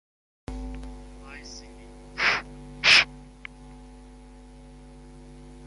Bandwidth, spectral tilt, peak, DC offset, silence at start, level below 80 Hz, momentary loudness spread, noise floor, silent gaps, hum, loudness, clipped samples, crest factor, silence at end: 11.5 kHz; -1.5 dB/octave; -6 dBFS; under 0.1%; 0.5 s; -46 dBFS; 27 LU; -47 dBFS; none; none; -20 LUFS; under 0.1%; 24 dB; 0 s